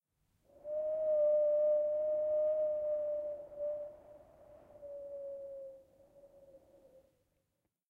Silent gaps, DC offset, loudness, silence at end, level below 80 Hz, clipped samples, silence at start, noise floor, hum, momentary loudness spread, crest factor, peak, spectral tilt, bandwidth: none; under 0.1%; -35 LUFS; 1.3 s; -76 dBFS; under 0.1%; 0.65 s; -85 dBFS; none; 20 LU; 12 dB; -24 dBFS; -7.5 dB/octave; 2.4 kHz